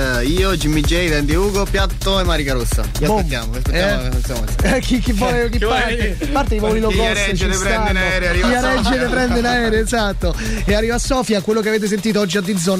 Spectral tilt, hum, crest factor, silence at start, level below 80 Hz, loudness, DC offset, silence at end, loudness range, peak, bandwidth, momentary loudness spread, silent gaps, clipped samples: -4.5 dB/octave; none; 10 dB; 0 s; -22 dBFS; -17 LUFS; under 0.1%; 0 s; 2 LU; -6 dBFS; 16 kHz; 4 LU; none; under 0.1%